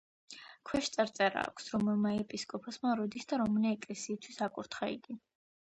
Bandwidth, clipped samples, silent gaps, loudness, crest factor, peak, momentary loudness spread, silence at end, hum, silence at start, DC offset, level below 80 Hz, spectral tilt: 9.8 kHz; under 0.1%; none; -35 LUFS; 20 dB; -14 dBFS; 17 LU; 0.4 s; none; 0.3 s; under 0.1%; -68 dBFS; -4.5 dB/octave